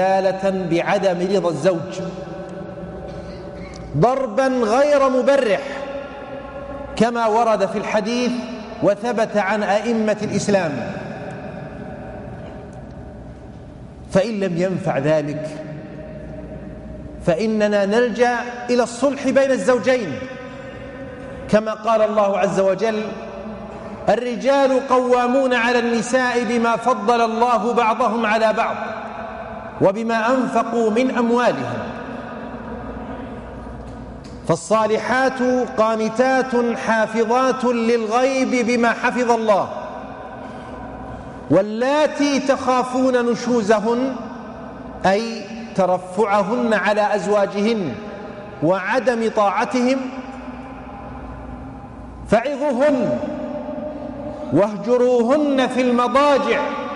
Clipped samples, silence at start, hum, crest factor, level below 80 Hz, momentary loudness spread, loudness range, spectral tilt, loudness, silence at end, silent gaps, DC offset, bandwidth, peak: under 0.1%; 0 s; none; 14 dB; -46 dBFS; 17 LU; 5 LU; -5.5 dB/octave; -19 LUFS; 0 s; none; under 0.1%; 11.5 kHz; -6 dBFS